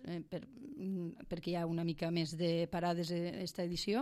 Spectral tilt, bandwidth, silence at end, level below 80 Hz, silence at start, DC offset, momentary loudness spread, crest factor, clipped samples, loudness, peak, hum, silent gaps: -6 dB/octave; 14 kHz; 0 s; -64 dBFS; 0 s; under 0.1%; 9 LU; 14 dB; under 0.1%; -39 LUFS; -24 dBFS; none; none